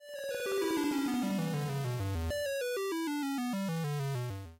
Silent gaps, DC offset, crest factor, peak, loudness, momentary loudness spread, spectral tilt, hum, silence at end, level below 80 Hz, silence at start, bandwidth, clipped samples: none; under 0.1%; 10 dB; -24 dBFS; -34 LUFS; 4 LU; -5.5 dB/octave; none; 0.05 s; -54 dBFS; 0 s; 16 kHz; under 0.1%